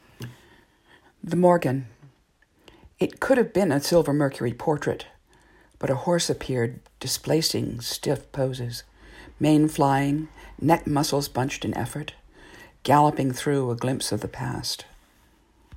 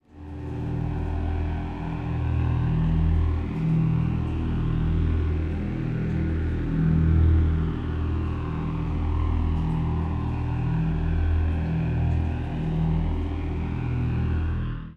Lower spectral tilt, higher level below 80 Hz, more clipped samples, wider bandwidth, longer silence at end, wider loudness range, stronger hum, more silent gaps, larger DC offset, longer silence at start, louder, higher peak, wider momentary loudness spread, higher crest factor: second, -5.5 dB/octave vs -10 dB/octave; second, -52 dBFS vs -30 dBFS; neither; first, 16 kHz vs 4.5 kHz; about the same, 0 s vs 0 s; about the same, 3 LU vs 2 LU; neither; neither; second, under 0.1% vs 0.2%; about the same, 0.2 s vs 0.15 s; about the same, -24 LUFS vs -26 LUFS; first, -4 dBFS vs -10 dBFS; first, 14 LU vs 6 LU; first, 20 dB vs 14 dB